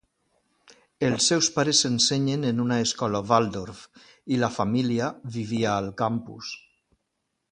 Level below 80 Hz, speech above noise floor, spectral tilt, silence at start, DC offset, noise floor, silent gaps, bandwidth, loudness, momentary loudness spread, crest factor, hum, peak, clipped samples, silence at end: -58 dBFS; 54 dB; -4 dB/octave; 1 s; under 0.1%; -79 dBFS; none; 10 kHz; -24 LUFS; 16 LU; 22 dB; none; -4 dBFS; under 0.1%; 0.95 s